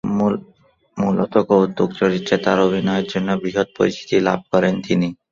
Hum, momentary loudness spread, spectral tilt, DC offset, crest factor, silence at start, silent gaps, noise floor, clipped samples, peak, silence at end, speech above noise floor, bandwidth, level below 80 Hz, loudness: none; 5 LU; -6.5 dB/octave; under 0.1%; 16 dB; 0.05 s; none; -55 dBFS; under 0.1%; -2 dBFS; 0.2 s; 37 dB; 7.4 kHz; -54 dBFS; -19 LUFS